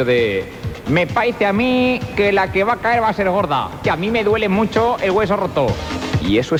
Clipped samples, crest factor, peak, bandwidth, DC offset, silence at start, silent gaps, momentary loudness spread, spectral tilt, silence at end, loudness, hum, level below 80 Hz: under 0.1%; 12 dB; -4 dBFS; 16.5 kHz; under 0.1%; 0 s; none; 5 LU; -6.5 dB/octave; 0 s; -17 LUFS; none; -38 dBFS